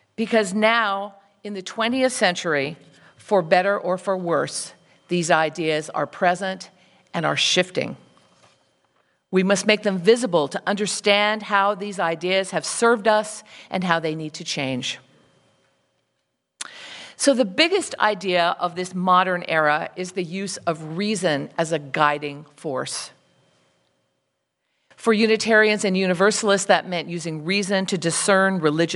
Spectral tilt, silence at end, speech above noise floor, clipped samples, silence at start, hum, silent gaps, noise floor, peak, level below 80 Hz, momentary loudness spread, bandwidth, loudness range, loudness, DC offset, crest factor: -3.5 dB/octave; 0 s; 54 dB; under 0.1%; 0.2 s; none; none; -75 dBFS; 0 dBFS; -72 dBFS; 12 LU; 11.5 kHz; 6 LU; -21 LUFS; under 0.1%; 22 dB